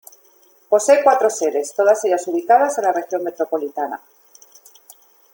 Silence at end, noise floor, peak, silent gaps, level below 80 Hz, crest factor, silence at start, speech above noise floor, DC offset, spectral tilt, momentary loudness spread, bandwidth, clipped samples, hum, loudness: 1.4 s; -53 dBFS; -2 dBFS; none; -74 dBFS; 18 dB; 0.7 s; 36 dB; under 0.1%; -2.5 dB/octave; 12 LU; 17 kHz; under 0.1%; none; -18 LUFS